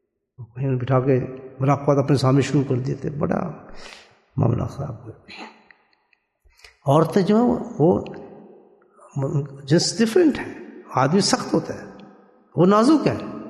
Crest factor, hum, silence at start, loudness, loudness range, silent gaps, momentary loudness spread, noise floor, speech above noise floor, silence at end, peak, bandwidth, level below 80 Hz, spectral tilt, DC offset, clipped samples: 18 dB; none; 0.4 s; -20 LUFS; 7 LU; none; 21 LU; -66 dBFS; 46 dB; 0 s; -4 dBFS; 12.5 kHz; -54 dBFS; -6 dB/octave; under 0.1%; under 0.1%